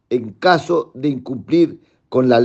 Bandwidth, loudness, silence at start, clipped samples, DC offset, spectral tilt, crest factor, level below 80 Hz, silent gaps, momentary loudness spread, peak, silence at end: 8 kHz; -18 LUFS; 0.1 s; under 0.1%; under 0.1%; -7 dB/octave; 16 dB; -64 dBFS; none; 8 LU; 0 dBFS; 0 s